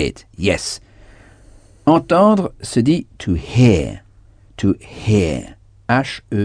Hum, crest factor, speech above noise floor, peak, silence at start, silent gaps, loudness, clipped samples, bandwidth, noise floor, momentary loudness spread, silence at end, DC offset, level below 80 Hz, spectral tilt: none; 18 dB; 31 dB; 0 dBFS; 0 s; none; -17 LUFS; under 0.1%; 10 kHz; -47 dBFS; 13 LU; 0 s; under 0.1%; -38 dBFS; -6.5 dB/octave